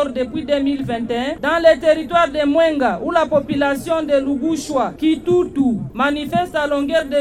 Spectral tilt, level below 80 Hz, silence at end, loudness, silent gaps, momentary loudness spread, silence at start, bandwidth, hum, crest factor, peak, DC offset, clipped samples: -5.5 dB/octave; -44 dBFS; 0 s; -18 LUFS; none; 6 LU; 0 s; 15 kHz; none; 14 dB; -2 dBFS; under 0.1%; under 0.1%